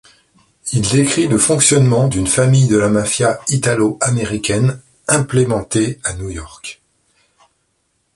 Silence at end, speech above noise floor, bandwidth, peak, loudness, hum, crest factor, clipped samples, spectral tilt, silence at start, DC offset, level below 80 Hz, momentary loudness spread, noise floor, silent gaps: 1.45 s; 51 dB; 11.5 kHz; 0 dBFS; -14 LUFS; none; 16 dB; under 0.1%; -4.5 dB/octave; 0.65 s; under 0.1%; -40 dBFS; 16 LU; -65 dBFS; none